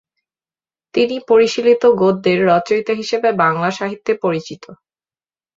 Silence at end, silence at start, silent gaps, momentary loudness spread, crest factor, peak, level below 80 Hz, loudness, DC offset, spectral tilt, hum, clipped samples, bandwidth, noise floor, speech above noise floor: 0.85 s; 0.95 s; none; 10 LU; 16 dB; -2 dBFS; -60 dBFS; -16 LUFS; under 0.1%; -5.5 dB/octave; none; under 0.1%; 7.6 kHz; under -90 dBFS; over 75 dB